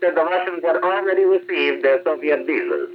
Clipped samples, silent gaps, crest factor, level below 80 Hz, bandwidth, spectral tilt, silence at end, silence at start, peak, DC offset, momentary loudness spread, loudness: under 0.1%; none; 14 dB; -84 dBFS; 5.6 kHz; -6 dB/octave; 0 s; 0 s; -6 dBFS; under 0.1%; 3 LU; -19 LUFS